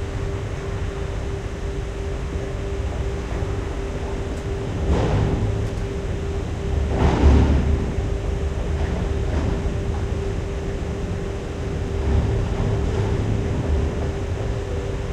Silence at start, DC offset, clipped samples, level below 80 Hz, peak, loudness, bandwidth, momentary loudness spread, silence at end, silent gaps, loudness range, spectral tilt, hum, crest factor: 0 s; under 0.1%; under 0.1%; -26 dBFS; -4 dBFS; -24 LUFS; 9.6 kHz; 8 LU; 0 s; none; 6 LU; -7.5 dB/octave; none; 18 dB